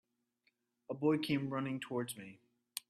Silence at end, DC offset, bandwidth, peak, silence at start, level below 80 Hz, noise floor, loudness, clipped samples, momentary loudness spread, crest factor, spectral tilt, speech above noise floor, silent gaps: 0.1 s; under 0.1%; 14.5 kHz; -20 dBFS; 0.9 s; -78 dBFS; -80 dBFS; -38 LUFS; under 0.1%; 14 LU; 20 dB; -5.5 dB/octave; 43 dB; none